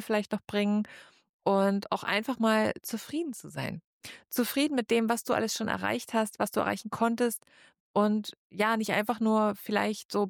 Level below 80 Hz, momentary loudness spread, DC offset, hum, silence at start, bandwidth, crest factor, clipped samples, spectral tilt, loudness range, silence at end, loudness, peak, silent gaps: -70 dBFS; 10 LU; under 0.1%; none; 0 s; 19.5 kHz; 16 dB; under 0.1%; -4.5 dB/octave; 2 LU; 0 s; -29 LUFS; -14 dBFS; 1.29-1.39 s, 3.84-4.01 s, 7.80-7.94 s, 8.37-8.50 s, 10.05-10.09 s